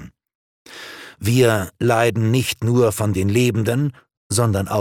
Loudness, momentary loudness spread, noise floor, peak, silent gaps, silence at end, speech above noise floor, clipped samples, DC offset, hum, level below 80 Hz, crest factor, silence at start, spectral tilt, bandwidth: -19 LUFS; 11 LU; -38 dBFS; -2 dBFS; 0.35-0.65 s, 4.17-4.30 s; 0 s; 20 dB; under 0.1%; under 0.1%; none; -50 dBFS; 18 dB; 0 s; -5.5 dB/octave; 17 kHz